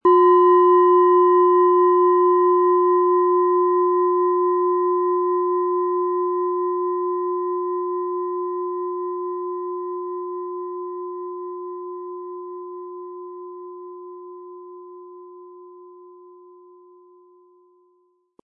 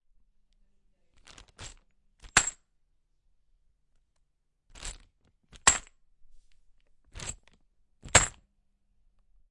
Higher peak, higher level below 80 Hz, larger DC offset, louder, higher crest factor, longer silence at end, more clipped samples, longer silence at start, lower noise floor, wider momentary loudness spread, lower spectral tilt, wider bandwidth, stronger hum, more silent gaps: about the same, -6 dBFS vs -4 dBFS; second, -80 dBFS vs -50 dBFS; neither; first, -19 LUFS vs -25 LUFS; second, 14 dB vs 30 dB; first, 2.5 s vs 1.2 s; neither; second, 0.05 s vs 1.6 s; second, -64 dBFS vs -74 dBFS; about the same, 22 LU vs 24 LU; first, -9 dB/octave vs -0.5 dB/octave; second, 3.1 kHz vs 11.5 kHz; neither; neither